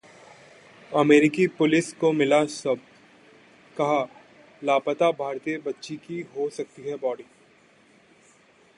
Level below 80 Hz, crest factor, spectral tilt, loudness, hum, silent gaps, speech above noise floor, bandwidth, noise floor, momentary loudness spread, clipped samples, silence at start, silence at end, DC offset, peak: -72 dBFS; 20 dB; -5.5 dB/octave; -24 LUFS; none; none; 34 dB; 11 kHz; -57 dBFS; 16 LU; under 0.1%; 0.9 s; 1.55 s; under 0.1%; -6 dBFS